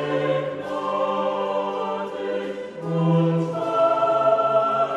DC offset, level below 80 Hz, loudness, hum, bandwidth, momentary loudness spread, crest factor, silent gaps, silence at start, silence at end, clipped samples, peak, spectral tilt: under 0.1%; -68 dBFS; -23 LUFS; none; 8.8 kHz; 9 LU; 14 dB; none; 0 s; 0 s; under 0.1%; -8 dBFS; -8 dB/octave